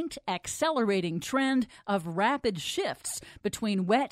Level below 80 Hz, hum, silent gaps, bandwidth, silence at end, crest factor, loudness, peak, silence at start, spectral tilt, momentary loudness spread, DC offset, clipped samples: -62 dBFS; none; none; 16 kHz; 0.05 s; 16 dB; -30 LUFS; -12 dBFS; 0 s; -4.5 dB/octave; 8 LU; under 0.1%; under 0.1%